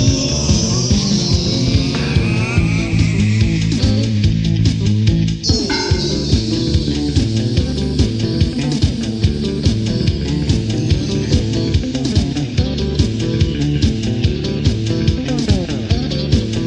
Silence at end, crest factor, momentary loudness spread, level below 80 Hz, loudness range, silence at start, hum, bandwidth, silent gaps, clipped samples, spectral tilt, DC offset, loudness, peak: 0 s; 16 dB; 3 LU; -24 dBFS; 2 LU; 0 s; none; 9.6 kHz; none; under 0.1%; -5.5 dB/octave; under 0.1%; -16 LUFS; 0 dBFS